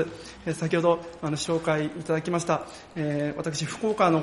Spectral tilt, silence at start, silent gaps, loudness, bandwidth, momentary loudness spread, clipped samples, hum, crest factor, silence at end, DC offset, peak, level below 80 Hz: -5.5 dB/octave; 0 s; none; -27 LUFS; 11.5 kHz; 9 LU; under 0.1%; none; 20 dB; 0 s; under 0.1%; -8 dBFS; -58 dBFS